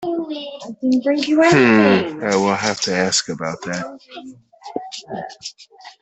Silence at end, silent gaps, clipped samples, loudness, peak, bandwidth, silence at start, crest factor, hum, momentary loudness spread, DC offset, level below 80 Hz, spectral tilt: 0.1 s; none; under 0.1%; -17 LUFS; -2 dBFS; 8.4 kHz; 0 s; 16 dB; none; 20 LU; under 0.1%; -60 dBFS; -4 dB/octave